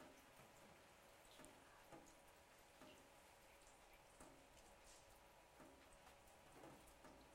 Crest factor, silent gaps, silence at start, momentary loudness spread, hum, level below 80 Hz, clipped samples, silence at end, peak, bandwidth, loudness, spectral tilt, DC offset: 24 dB; none; 0 s; 4 LU; none; -78 dBFS; under 0.1%; 0 s; -42 dBFS; 16 kHz; -66 LUFS; -3 dB/octave; under 0.1%